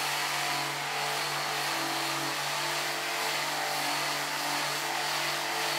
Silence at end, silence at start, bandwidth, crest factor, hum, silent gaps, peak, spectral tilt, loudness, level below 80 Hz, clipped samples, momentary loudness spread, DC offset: 0 s; 0 s; 16 kHz; 14 dB; none; none; -16 dBFS; -1 dB/octave; -29 LUFS; -82 dBFS; under 0.1%; 1 LU; under 0.1%